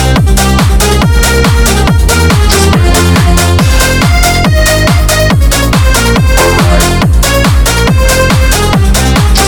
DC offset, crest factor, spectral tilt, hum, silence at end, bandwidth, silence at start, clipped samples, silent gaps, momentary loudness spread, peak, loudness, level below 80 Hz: under 0.1%; 6 dB; -4.5 dB/octave; none; 0 s; over 20 kHz; 0 s; 0.6%; none; 1 LU; 0 dBFS; -7 LUFS; -10 dBFS